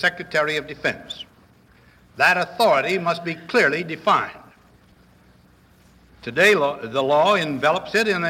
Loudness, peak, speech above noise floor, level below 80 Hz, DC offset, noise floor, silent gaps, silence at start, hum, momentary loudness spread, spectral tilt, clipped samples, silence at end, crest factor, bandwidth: -20 LUFS; -4 dBFS; 33 dB; -60 dBFS; under 0.1%; -54 dBFS; none; 0 s; none; 13 LU; -4 dB/octave; under 0.1%; 0 s; 18 dB; 16.5 kHz